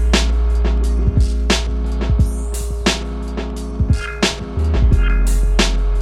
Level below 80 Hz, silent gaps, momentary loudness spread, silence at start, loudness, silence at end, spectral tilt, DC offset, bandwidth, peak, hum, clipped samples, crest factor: -16 dBFS; none; 8 LU; 0 s; -18 LUFS; 0 s; -5 dB/octave; under 0.1%; 12.5 kHz; 0 dBFS; none; under 0.1%; 16 dB